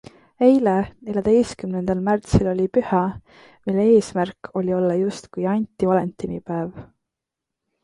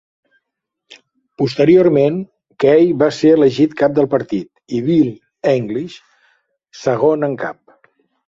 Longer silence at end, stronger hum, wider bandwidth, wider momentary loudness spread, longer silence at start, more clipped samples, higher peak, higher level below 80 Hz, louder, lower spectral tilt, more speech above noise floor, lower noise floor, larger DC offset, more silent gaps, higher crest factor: first, 1 s vs 0.75 s; neither; first, 11.5 kHz vs 7.6 kHz; about the same, 11 LU vs 13 LU; second, 0.4 s vs 1.4 s; neither; about the same, -2 dBFS vs 0 dBFS; first, -44 dBFS vs -56 dBFS; second, -21 LUFS vs -15 LUFS; about the same, -7.5 dB/octave vs -7.5 dB/octave; about the same, 64 dB vs 65 dB; first, -84 dBFS vs -79 dBFS; neither; neither; about the same, 20 dB vs 16 dB